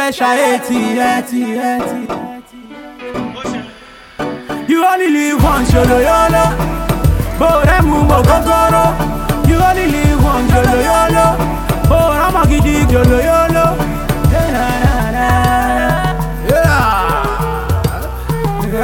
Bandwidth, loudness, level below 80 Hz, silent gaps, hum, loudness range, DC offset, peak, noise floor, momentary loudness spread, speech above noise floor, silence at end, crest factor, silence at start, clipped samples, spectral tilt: 19 kHz; -13 LUFS; -20 dBFS; none; none; 7 LU; under 0.1%; 0 dBFS; -36 dBFS; 12 LU; 25 dB; 0 s; 12 dB; 0 s; under 0.1%; -6 dB/octave